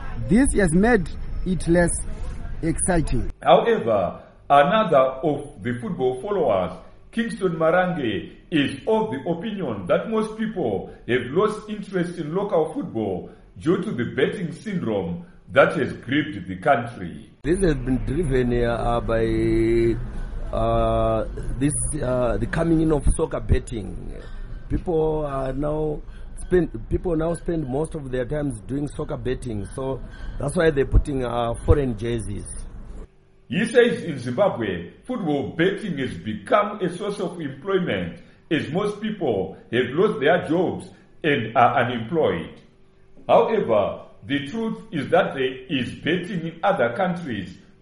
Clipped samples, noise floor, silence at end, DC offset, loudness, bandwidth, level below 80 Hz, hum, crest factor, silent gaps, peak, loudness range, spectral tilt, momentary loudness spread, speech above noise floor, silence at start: under 0.1%; -51 dBFS; 0.25 s; under 0.1%; -23 LUFS; 11.5 kHz; -32 dBFS; none; 20 dB; none; -2 dBFS; 4 LU; -6 dB/octave; 13 LU; 29 dB; 0 s